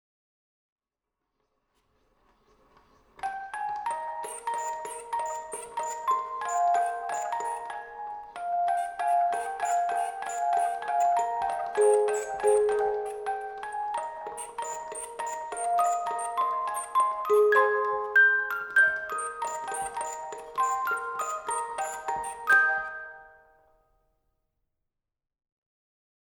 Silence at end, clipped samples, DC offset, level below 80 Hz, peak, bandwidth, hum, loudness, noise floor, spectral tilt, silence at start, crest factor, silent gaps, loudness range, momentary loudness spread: 2.95 s; under 0.1%; under 0.1%; -68 dBFS; -10 dBFS; 18.5 kHz; none; -28 LUFS; -87 dBFS; -1 dB/octave; 3.2 s; 18 dB; none; 11 LU; 14 LU